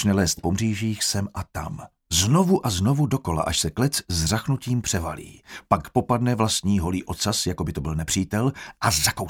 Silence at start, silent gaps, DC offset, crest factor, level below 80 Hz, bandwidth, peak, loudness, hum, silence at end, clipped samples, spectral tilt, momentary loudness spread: 0 s; none; under 0.1%; 20 dB; -42 dBFS; 19 kHz; -4 dBFS; -23 LUFS; none; 0 s; under 0.1%; -4.5 dB/octave; 11 LU